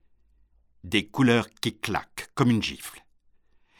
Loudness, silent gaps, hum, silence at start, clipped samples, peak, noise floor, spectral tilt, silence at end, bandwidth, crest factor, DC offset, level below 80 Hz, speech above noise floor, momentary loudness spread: -26 LUFS; none; none; 0.85 s; under 0.1%; -8 dBFS; -62 dBFS; -5.5 dB/octave; 0.8 s; 17 kHz; 20 dB; under 0.1%; -56 dBFS; 37 dB; 13 LU